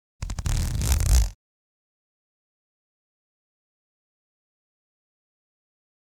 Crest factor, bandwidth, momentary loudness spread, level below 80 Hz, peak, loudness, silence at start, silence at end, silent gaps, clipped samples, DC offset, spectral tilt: 26 dB; 18.5 kHz; 10 LU; -30 dBFS; -2 dBFS; -25 LUFS; 0.2 s; 4.7 s; none; under 0.1%; under 0.1%; -4 dB/octave